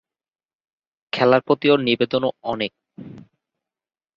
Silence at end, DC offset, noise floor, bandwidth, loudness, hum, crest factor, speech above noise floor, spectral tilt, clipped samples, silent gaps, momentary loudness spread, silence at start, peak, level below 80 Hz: 0.95 s; under 0.1%; under -90 dBFS; 7.2 kHz; -20 LUFS; none; 20 dB; over 70 dB; -7 dB/octave; under 0.1%; none; 13 LU; 1.15 s; -2 dBFS; -64 dBFS